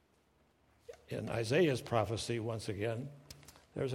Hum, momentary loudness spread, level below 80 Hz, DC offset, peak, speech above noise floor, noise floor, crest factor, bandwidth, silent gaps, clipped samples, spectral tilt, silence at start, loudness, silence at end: none; 23 LU; -66 dBFS; under 0.1%; -16 dBFS; 36 dB; -71 dBFS; 22 dB; 16 kHz; none; under 0.1%; -5.5 dB/octave; 0.9 s; -36 LUFS; 0 s